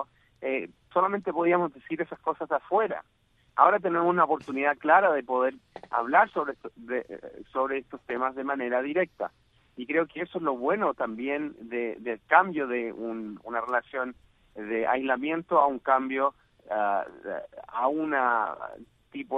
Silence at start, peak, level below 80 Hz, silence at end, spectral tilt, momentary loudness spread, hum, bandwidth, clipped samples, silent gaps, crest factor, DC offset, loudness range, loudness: 0 s; -4 dBFS; -68 dBFS; 0 s; -7.5 dB/octave; 15 LU; none; 5.4 kHz; under 0.1%; none; 24 dB; under 0.1%; 6 LU; -27 LUFS